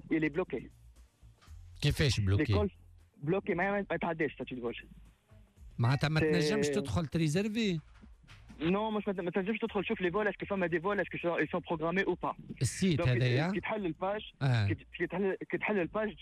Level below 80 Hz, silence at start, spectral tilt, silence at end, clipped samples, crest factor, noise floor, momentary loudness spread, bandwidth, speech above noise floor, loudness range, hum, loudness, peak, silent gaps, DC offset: -54 dBFS; 0.05 s; -6 dB/octave; 0 s; under 0.1%; 14 dB; -60 dBFS; 8 LU; 14 kHz; 28 dB; 2 LU; none; -33 LUFS; -20 dBFS; none; under 0.1%